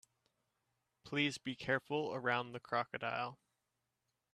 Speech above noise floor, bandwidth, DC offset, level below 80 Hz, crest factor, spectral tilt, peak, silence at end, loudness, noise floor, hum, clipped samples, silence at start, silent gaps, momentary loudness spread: 48 dB; 13 kHz; under 0.1%; -78 dBFS; 22 dB; -5 dB/octave; -20 dBFS; 1 s; -39 LUFS; -87 dBFS; none; under 0.1%; 1.05 s; none; 6 LU